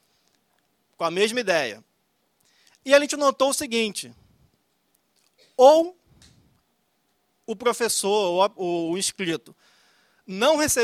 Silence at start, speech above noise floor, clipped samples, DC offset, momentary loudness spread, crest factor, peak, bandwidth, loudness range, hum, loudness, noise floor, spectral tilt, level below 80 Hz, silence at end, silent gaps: 1 s; 49 dB; under 0.1%; under 0.1%; 19 LU; 22 dB; -2 dBFS; 15.5 kHz; 3 LU; none; -22 LUFS; -70 dBFS; -2.5 dB/octave; -64 dBFS; 0 s; none